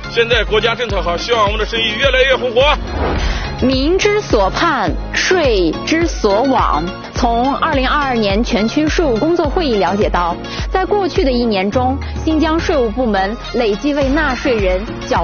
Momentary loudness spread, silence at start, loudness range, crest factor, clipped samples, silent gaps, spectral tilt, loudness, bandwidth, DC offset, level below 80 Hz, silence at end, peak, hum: 5 LU; 0 s; 2 LU; 14 dB; under 0.1%; none; -3.5 dB/octave; -15 LUFS; 6.8 kHz; under 0.1%; -24 dBFS; 0 s; 0 dBFS; none